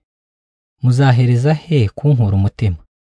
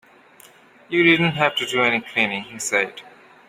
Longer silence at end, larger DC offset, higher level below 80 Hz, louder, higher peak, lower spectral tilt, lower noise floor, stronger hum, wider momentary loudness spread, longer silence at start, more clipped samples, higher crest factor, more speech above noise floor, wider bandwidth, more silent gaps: second, 0.3 s vs 0.45 s; neither; first, -42 dBFS vs -62 dBFS; first, -15 LUFS vs -19 LUFS; about the same, -2 dBFS vs -2 dBFS; first, -8 dB/octave vs -4 dB/octave; first, under -90 dBFS vs -50 dBFS; neither; about the same, 8 LU vs 9 LU; about the same, 0.85 s vs 0.9 s; neither; second, 14 dB vs 20 dB; first, over 77 dB vs 29 dB; second, 9.8 kHz vs 16 kHz; neither